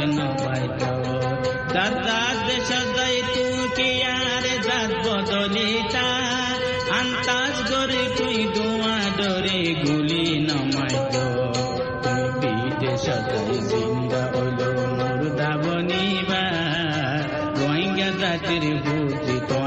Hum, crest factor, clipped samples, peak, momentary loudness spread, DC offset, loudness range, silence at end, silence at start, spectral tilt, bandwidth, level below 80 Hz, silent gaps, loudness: none; 14 dB; under 0.1%; -8 dBFS; 3 LU; under 0.1%; 2 LU; 0 s; 0 s; -4.5 dB/octave; 8.6 kHz; -48 dBFS; none; -22 LUFS